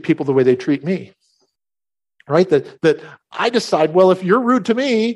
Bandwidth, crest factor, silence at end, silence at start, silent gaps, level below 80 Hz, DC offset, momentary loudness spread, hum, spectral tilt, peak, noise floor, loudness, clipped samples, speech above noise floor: 11.5 kHz; 16 dB; 0 s; 0.05 s; none; -64 dBFS; under 0.1%; 9 LU; none; -6 dB/octave; -2 dBFS; under -90 dBFS; -16 LUFS; under 0.1%; over 74 dB